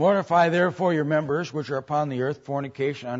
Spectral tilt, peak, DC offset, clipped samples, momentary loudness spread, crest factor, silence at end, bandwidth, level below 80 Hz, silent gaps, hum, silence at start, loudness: -7 dB/octave; -8 dBFS; under 0.1%; under 0.1%; 9 LU; 16 dB; 0 s; 8 kHz; -68 dBFS; none; none; 0 s; -24 LUFS